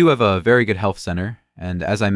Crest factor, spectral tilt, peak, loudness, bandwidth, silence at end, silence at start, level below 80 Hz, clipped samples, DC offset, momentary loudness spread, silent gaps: 16 dB; -6.5 dB/octave; -2 dBFS; -19 LUFS; 12 kHz; 0 s; 0 s; -48 dBFS; under 0.1%; under 0.1%; 14 LU; none